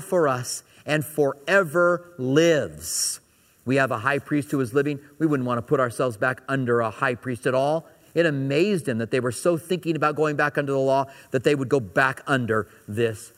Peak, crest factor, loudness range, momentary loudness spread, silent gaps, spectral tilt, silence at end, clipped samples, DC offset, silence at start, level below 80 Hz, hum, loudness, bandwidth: -4 dBFS; 18 dB; 2 LU; 6 LU; none; -5 dB/octave; 0.1 s; under 0.1%; under 0.1%; 0 s; -64 dBFS; none; -23 LUFS; 16 kHz